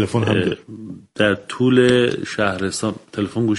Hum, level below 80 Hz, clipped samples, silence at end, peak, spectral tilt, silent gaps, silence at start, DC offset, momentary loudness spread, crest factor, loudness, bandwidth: none; -52 dBFS; under 0.1%; 0 s; 0 dBFS; -5.5 dB/octave; none; 0 s; under 0.1%; 15 LU; 18 dB; -19 LUFS; 11.5 kHz